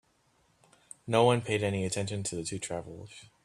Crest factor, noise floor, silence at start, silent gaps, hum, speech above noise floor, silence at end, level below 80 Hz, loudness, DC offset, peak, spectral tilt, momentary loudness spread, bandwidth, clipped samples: 24 dB; -69 dBFS; 1.05 s; none; none; 39 dB; 0.2 s; -64 dBFS; -30 LUFS; under 0.1%; -8 dBFS; -4.5 dB/octave; 22 LU; 13 kHz; under 0.1%